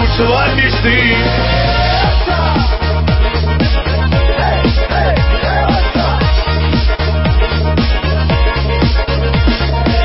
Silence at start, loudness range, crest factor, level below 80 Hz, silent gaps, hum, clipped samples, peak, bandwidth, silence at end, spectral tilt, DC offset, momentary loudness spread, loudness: 0 s; 1 LU; 10 dB; -14 dBFS; none; none; under 0.1%; 0 dBFS; 5.8 kHz; 0 s; -10 dB/octave; under 0.1%; 3 LU; -13 LUFS